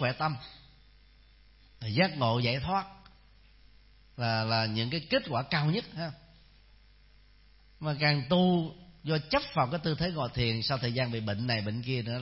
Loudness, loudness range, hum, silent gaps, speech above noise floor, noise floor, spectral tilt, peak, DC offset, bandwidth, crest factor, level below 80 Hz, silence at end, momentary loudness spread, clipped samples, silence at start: -30 LUFS; 4 LU; 50 Hz at -55 dBFS; none; 29 dB; -59 dBFS; -9.5 dB/octave; -12 dBFS; under 0.1%; 5.8 kHz; 20 dB; -56 dBFS; 0 s; 12 LU; under 0.1%; 0 s